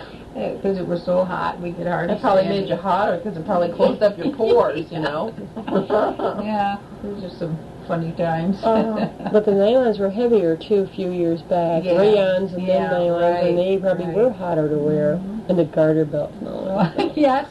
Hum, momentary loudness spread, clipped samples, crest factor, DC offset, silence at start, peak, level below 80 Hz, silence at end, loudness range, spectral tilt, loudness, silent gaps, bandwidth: none; 10 LU; under 0.1%; 16 dB; under 0.1%; 0 s; -4 dBFS; -50 dBFS; 0 s; 4 LU; -8 dB/octave; -20 LUFS; none; 12 kHz